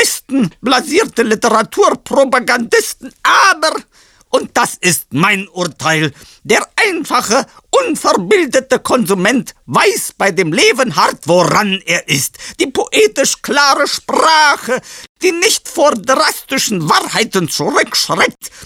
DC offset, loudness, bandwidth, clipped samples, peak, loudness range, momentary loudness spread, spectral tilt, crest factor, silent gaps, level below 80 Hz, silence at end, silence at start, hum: under 0.1%; -12 LUFS; 17.5 kHz; under 0.1%; 0 dBFS; 2 LU; 6 LU; -3 dB/octave; 14 dB; 15.09-15.15 s; -52 dBFS; 0 s; 0 s; none